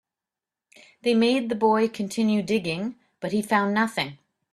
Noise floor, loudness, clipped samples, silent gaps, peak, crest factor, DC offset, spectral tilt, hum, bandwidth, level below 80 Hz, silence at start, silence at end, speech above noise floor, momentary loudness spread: -89 dBFS; -24 LUFS; under 0.1%; none; -8 dBFS; 18 dB; under 0.1%; -5.5 dB/octave; none; 13 kHz; -66 dBFS; 1.05 s; 0.4 s; 66 dB; 9 LU